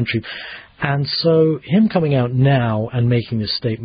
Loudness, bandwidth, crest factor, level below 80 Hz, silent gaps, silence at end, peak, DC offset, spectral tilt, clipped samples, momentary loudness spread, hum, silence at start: -17 LUFS; 5.2 kHz; 16 dB; -48 dBFS; none; 0 s; -2 dBFS; under 0.1%; -12.5 dB/octave; under 0.1%; 9 LU; none; 0 s